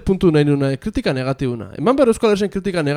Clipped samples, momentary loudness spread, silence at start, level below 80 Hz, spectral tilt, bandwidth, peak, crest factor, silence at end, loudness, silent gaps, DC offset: under 0.1%; 7 LU; 0 s; -38 dBFS; -7 dB/octave; 13.5 kHz; 0 dBFS; 16 dB; 0 s; -18 LUFS; none; under 0.1%